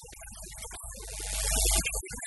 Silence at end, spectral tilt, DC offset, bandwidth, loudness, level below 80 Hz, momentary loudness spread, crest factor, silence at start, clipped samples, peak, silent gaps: 0 s; -1.5 dB/octave; under 0.1%; 12 kHz; -29 LUFS; -36 dBFS; 18 LU; 20 dB; 0 s; under 0.1%; -12 dBFS; none